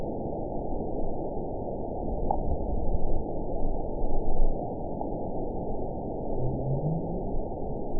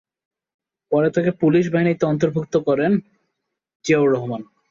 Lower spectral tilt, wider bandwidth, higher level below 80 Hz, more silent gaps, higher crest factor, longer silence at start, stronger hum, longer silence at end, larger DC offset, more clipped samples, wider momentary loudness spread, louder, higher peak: first, -17.5 dB/octave vs -7.5 dB/octave; second, 1 kHz vs 7.6 kHz; first, -30 dBFS vs -60 dBFS; second, none vs 3.75-3.80 s; about the same, 16 dB vs 16 dB; second, 0 s vs 0.9 s; neither; second, 0 s vs 0.25 s; first, 1% vs under 0.1%; neither; about the same, 4 LU vs 6 LU; second, -33 LUFS vs -19 LUFS; second, -10 dBFS vs -6 dBFS